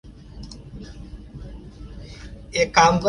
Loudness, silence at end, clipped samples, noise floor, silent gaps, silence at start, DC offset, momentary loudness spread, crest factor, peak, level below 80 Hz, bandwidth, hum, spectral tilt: -19 LUFS; 0 s; under 0.1%; -39 dBFS; none; 0.1 s; under 0.1%; 24 LU; 22 dB; -2 dBFS; -40 dBFS; 11 kHz; none; -4 dB/octave